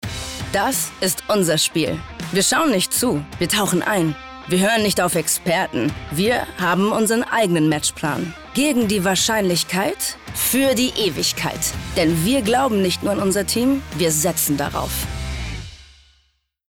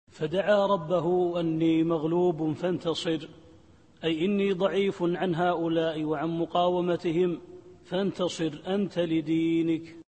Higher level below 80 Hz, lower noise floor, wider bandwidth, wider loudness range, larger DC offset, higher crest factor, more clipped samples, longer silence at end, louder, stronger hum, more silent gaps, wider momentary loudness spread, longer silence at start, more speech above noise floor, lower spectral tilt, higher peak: first, -40 dBFS vs -64 dBFS; first, -64 dBFS vs -56 dBFS; first, 19 kHz vs 8.8 kHz; about the same, 1 LU vs 2 LU; neither; about the same, 12 dB vs 16 dB; neither; first, 0.85 s vs 0.05 s; first, -19 LUFS vs -27 LUFS; neither; neither; about the same, 7 LU vs 6 LU; about the same, 0.05 s vs 0.15 s; first, 45 dB vs 30 dB; second, -3.5 dB/octave vs -7 dB/octave; first, -8 dBFS vs -12 dBFS